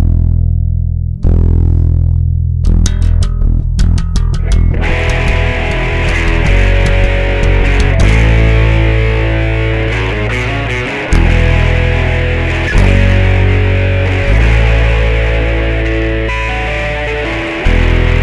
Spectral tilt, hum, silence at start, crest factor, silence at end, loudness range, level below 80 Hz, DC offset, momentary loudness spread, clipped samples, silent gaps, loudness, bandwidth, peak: -6.5 dB/octave; none; 0 s; 10 dB; 0 s; 2 LU; -12 dBFS; under 0.1%; 5 LU; under 0.1%; none; -12 LUFS; 10.5 kHz; 0 dBFS